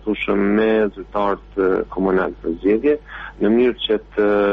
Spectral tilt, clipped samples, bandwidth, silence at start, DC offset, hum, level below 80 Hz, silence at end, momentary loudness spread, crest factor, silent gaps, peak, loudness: -4.5 dB/octave; under 0.1%; 5.2 kHz; 0 s; under 0.1%; none; -42 dBFS; 0 s; 6 LU; 12 dB; none; -6 dBFS; -19 LUFS